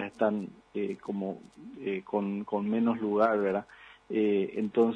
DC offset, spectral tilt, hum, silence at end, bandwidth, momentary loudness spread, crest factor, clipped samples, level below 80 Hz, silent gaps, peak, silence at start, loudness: under 0.1%; -8.5 dB/octave; none; 0 s; 7.4 kHz; 13 LU; 18 dB; under 0.1%; -72 dBFS; none; -12 dBFS; 0 s; -31 LUFS